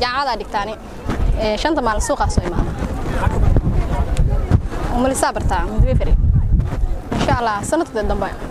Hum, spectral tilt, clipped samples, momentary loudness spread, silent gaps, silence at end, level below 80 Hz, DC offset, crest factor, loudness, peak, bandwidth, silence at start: none; -6 dB/octave; under 0.1%; 6 LU; none; 0 s; -20 dBFS; under 0.1%; 14 dB; -19 LUFS; -2 dBFS; 13 kHz; 0 s